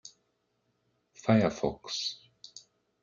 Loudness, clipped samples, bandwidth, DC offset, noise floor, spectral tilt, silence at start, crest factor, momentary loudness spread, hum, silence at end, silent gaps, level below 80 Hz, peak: -30 LUFS; under 0.1%; 7.6 kHz; under 0.1%; -77 dBFS; -5.5 dB/octave; 0.05 s; 22 dB; 24 LU; none; 0.45 s; none; -62 dBFS; -12 dBFS